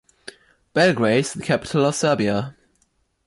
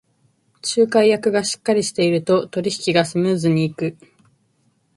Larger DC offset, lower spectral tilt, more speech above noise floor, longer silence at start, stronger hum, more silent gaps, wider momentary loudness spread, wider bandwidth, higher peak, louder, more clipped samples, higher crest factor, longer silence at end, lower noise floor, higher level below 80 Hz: neither; about the same, -5 dB/octave vs -5 dB/octave; about the same, 47 dB vs 45 dB; about the same, 0.75 s vs 0.65 s; neither; neither; first, 22 LU vs 8 LU; about the same, 11.5 kHz vs 11.5 kHz; second, -6 dBFS vs -2 dBFS; about the same, -20 LUFS vs -19 LUFS; neither; about the same, 16 dB vs 18 dB; second, 0.75 s vs 1.05 s; about the same, -66 dBFS vs -63 dBFS; first, -56 dBFS vs -62 dBFS